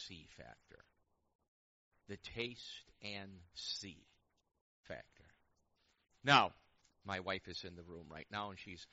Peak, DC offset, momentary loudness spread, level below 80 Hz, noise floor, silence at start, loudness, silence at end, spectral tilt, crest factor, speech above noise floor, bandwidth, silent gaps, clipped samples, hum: -14 dBFS; under 0.1%; 24 LU; -72 dBFS; -79 dBFS; 0 s; -39 LUFS; 0.1 s; -1.5 dB/octave; 30 dB; 37 dB; 7.6 kHz; 1.35-1.39 s, 1.48-1.91 s, 4.61-4.84 s; under 0.1%; none